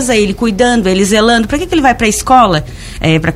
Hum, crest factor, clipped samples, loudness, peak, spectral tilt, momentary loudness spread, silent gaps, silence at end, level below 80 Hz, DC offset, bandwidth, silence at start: none; 10 dB; 0.1%; -10 LUFS; 0 dBFS; -4.5 dB/octave; 6 LU; none; 0 s; -28 dBFS; under 0.1%; 15.5 kHz; 0 s